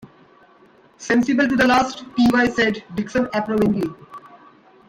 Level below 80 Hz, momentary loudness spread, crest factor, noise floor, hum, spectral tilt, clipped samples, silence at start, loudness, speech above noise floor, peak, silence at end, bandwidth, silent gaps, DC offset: -50 dBFS; 10 LU; 16 dB; -52 dBFS; none; -5 dB/octave; under 0.1%; 1 s; -19 LUFS; 33 dB; -4 dBFS; 0.7 s; 15.5 kHz; none; under 0.1%